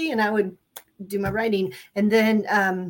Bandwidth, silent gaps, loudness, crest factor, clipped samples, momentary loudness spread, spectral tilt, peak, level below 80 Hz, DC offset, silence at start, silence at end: 17 kHz; none; -23 LUFS; 16 dB; under 0.1%; 10 LU; -6 dB/octave; -8 dBFS; -54 dBFS; under 0.1%; 0 s; 0 s